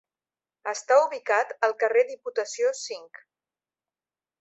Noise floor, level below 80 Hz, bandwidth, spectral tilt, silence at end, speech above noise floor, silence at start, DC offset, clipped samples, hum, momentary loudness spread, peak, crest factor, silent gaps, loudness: under -90 dBFS; -84 dBFS; 8.2 kHz; 0.5 dB/octave; 1.35 s; over 65 dB; 0.65 s; under 0.1%; under 0.1%; none; 14 LU; -8 dBFS; 20 dB; none; -25 LUFS